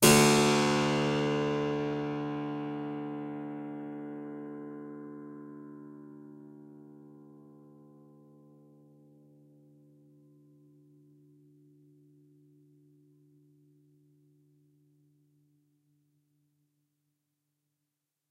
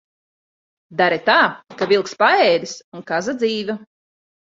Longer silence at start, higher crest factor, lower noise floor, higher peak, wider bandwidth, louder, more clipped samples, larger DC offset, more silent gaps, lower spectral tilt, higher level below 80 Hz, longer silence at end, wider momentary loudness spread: second, 0 s vs 0.9 s; first, 28 dB vs 18 dB; second, -86 dBFS vs under -90 dBFS; second, -6 dBFS vs -2 dBFS; first, 16 kHz vs 7.8 kHz; second, -30 LUFS vs -18 LUFS; neither; neither; second, none vs 2.84-2.92 s; about the same, -4 dB/octave vs -3.5 dB/octave; about the same, -64 dBFS vs -66 dBFS; first, 10.85 s vs 0.7 s; first, 27 LU vs 15 LU